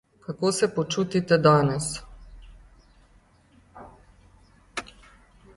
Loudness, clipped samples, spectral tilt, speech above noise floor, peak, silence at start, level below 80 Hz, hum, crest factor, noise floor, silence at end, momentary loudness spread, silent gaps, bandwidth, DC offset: -24 LUFS; under 0.1%; -5 dB/octave; 36 dB; -6 dBFS; 0.3 s; -52 dBFS; none; 22 dB; -58 dBFS; 0.75 s; 18 LU; none; 11.5 kHz; under 0.1%